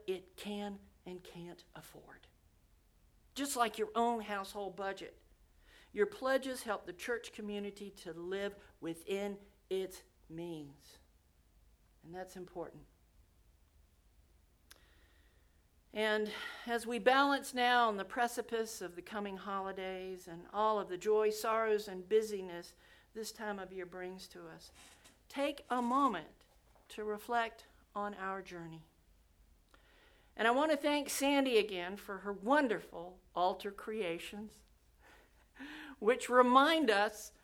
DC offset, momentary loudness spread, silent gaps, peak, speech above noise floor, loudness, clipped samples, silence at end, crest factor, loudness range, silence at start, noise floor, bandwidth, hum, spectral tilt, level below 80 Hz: under 0.1%; 20 LU; none; -14 dBFS; 33 dB; -36 LUFS; under 0.1%; 0.15 s; 24 dB; 14 LU; 0.05 s; -69 dBFS; over 20 kHz; none; -3.5 dB/octave; -70 dBFS